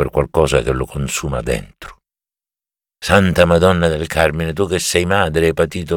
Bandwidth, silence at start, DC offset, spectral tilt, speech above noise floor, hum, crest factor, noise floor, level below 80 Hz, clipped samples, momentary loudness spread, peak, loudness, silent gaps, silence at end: 18.5 kHz; 0 s; under 0.1%; -5 dB/octave; over 74 dB; none; 16 dB; under -90 dBFS; -32 dBFS; under 0.1%; 9 LU; 0 dBFS; -16 LUFS; none; 0 s